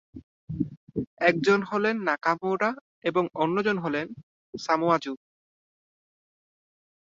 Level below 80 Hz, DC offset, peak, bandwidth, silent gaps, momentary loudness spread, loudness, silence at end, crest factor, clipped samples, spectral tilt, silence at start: -62 dBFS; under 0.1%; -4 dBFS; 7.8 kHz; 0.23-0.47 s, 0.77-0.87 s, 1.07-1.17 s, 2.81-3.02 s, 4.23-4.53 s; 14 LU; -26 LUFS; 1.9 s; 24 dB; under 0.1%; -6 dB/octave; 0.15 s